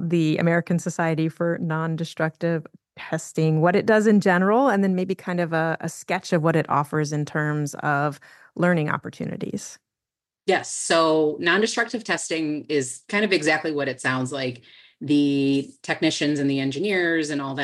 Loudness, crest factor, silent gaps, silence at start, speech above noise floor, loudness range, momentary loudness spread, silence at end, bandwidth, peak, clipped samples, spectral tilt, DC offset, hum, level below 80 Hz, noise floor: -23 LUFS; 18 dB; none; 0 s; 67 dB; 4 LU; 11 LU; 0 s; 12.5 kHz; -6 dBFS; under 0.1%; -5.5 dB/octave; under 0.1%; none; -72 dBFS; -89 dBFS